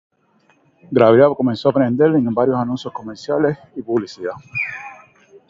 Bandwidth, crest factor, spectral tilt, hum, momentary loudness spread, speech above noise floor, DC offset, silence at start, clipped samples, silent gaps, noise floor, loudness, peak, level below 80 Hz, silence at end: 7.6 kHz; 18 dB; -8 dB/octave; none; 17 LU; 41 dB; under 0.1%; 0.9 s; under 0.1%; none; -58 dBFS; -17 LUFS; 0 dBFS; -58 dBFS; 0.55 s